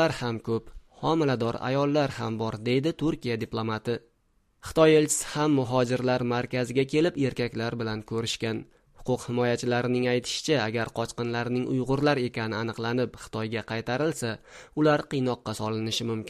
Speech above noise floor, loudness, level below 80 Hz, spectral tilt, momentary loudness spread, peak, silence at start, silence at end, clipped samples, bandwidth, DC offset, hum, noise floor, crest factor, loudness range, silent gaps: 41 dB; -27 LUFS; -54 dBFS; -5 dB/octave; 8 LU; -6 dBFS; 0 s; 0 s; under 0.1%; 15 kHz; under 0.1%; none; -68 dBFS; 20 dB; 4 LU; none